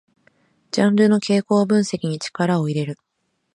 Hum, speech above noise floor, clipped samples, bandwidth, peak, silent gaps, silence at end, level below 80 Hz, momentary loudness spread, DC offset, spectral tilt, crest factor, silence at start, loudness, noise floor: none; 54 dB; under 0.1%; 11 kHz; -4 dBFS; none; 0.6 s; -64 dBFS; 10 LU; under 0.1%; -6 dB/octave; 16 dB; 0.75 s; -19 LUFS; -72 dBFS